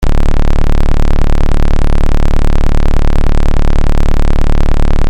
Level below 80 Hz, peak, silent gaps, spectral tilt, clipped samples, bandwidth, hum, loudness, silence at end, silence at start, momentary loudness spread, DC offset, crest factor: -8 dBFS; -2 dBFS; none; -7 dB/octave; under 0.1%; 6.2 kHz; none; -15 LUFS; 0 s; 0 s; 0 LU; under 0.1%; 4 dB